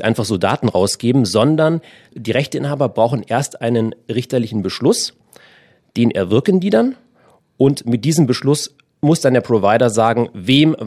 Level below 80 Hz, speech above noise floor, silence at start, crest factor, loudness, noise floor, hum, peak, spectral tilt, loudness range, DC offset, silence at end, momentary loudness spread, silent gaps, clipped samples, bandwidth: -58 dBFS; 38 dB; 0 s; 16 dB; -16 LUFS; -54 dBFS; none; 0 dBFS; -5.5 dB/octave; 3 LU; under 0.1%; 0 s; 7 LU; none; under 0.1%; 14 kHz